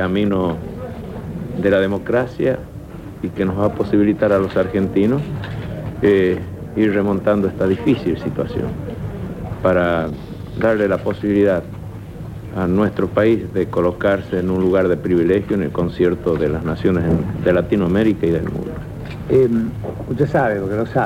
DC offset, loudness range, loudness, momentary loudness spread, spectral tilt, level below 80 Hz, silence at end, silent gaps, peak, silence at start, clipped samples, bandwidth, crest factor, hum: under 0.1%; 3 LU; -18 LUFS; 12 LU; -8.5 dB/octave; -38 dBFS; 0 s; none; -4 dBFS; 0 s; under 0.1%; 16 kHz; 14 dB; none